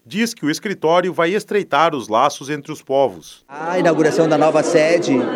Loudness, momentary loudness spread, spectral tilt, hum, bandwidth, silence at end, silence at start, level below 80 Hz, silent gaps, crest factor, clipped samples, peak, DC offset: -17 LUFS; 9 LU; -5 dB/octave; none; 16 kHz; 0 s; 0.1 s; -68 dBFS; none; 16 dB; under 0.1%; 0 dBFS; under 0.1%